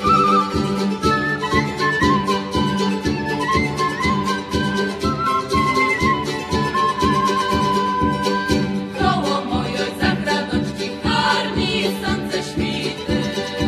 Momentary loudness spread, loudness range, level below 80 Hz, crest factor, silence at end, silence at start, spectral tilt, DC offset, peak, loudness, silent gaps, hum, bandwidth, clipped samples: 5 LU; 2 LU; -38 dBFS; 18 dB; 0 s; 0 s; -5 dB/octave; under 0.1%; -2 dBFS; -19 LUFS; none; none; 14 kHz; under 0.1%